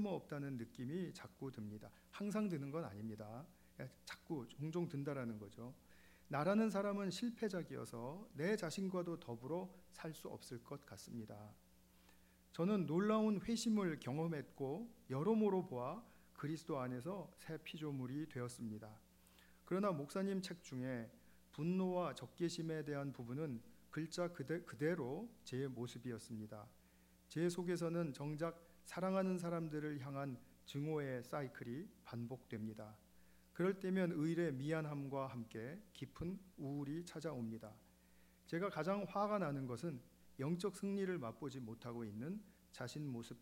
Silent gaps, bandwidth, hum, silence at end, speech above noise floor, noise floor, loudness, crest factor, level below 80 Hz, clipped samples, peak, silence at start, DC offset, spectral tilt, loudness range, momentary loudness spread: none; 16 kHz; none; 0 s; 26 dB; -70 dBFS; -44 LUFS; 20 dB; -74 dBFS; under 0.1%; -26 dBFS; 0 s; under 0.1%; -6.5 dB/octave; 7 LU; 14 LU